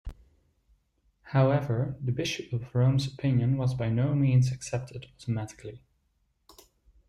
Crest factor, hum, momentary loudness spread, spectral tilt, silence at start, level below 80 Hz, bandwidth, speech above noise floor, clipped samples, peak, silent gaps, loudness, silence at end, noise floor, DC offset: 16 dB; none; 16 LU; -7 dB/octave; 0.05 s; -54 dBFS; 11 kHz; 46 dB; under 0.1%; -14 dBFS; none; -28 LUFS; 1.3 s; -73 dBFS; under 0.1%